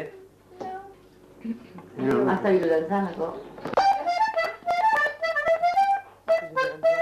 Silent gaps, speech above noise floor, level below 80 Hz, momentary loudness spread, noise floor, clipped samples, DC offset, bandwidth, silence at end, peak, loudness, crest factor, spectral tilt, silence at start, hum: none; 26 dB; -62 dBFS; 16 LU; -51 dBFS; under 0.1%; under 0.1%; 14 kHz; 0 s; -12 dBFS; -24 LUFS; 14 dB; -6 dB/octave; 0 s; none